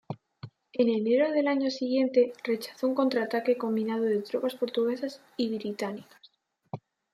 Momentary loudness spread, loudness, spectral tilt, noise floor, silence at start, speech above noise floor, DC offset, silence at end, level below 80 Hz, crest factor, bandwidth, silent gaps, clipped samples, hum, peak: 19 LU; -28 LUFS; -6 dB/octave; -62 dBFS; 0.1 s; 34 dB; under 0.1%; 0.35 s; -78 dBFS; 16 dB; 14.5 kHz; none; under 0.1%; none; -12 dBFS